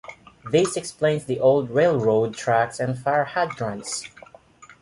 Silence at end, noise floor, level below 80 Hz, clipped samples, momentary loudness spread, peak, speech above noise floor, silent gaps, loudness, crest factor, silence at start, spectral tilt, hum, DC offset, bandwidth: 0.15 s; -49 dBFS; -60 dBFS; under 0.1%; 11 LU; -6 dBFS; 28 dB; none; -22 LUFS; 16 dB; 0.1 s; -5 dB/octave; none; under 0.1%; 11.5 kHz